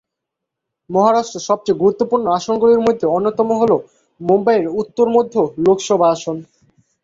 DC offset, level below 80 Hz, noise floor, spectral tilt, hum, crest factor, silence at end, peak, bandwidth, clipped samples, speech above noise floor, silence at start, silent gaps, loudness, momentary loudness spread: under 0.1%; -56 dBFS; -80 dBFS; -6 dB/octave; none; 14 dB; 0.6 s; -2 dBFS; 7.8 kHz; under 0.1%; 65 dB; 0.9 s; none; -16 LUFS; 7 LU